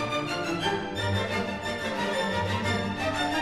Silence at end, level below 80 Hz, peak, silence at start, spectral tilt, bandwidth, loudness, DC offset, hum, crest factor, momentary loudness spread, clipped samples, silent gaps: 0 s; -52 dBFS; -14 dBFS; 0 s; -4.5 dB/octave; 13 kHz; -28 LUFS; under 0.1%; none; 14 dB; 2 LU; under 0.1%; none